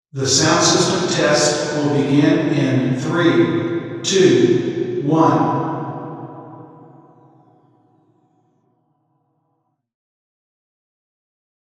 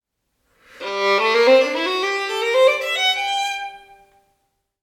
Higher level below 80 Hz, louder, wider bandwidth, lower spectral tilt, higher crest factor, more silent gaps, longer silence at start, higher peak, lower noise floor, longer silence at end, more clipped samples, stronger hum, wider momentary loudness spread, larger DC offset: first, -60 dBFS vs -68 dBFS; about the same, -16 LUFS vs -18 LUFS; second, 12 kHz vs 15.5 kHz; first, -4.5 dB/octave vs -1 dB/octave; about the same, 18 dB vs 18 dB; neither; second, 0.15 s vs 0.8 s; about the same, 0 dBFS vs -2 dBFS; about the same, -69 dBFS vs -71 dBFS; first, 5.05 s vs 1.05 s; neither; neither; about the same, 13 LU vs 13 LU; neither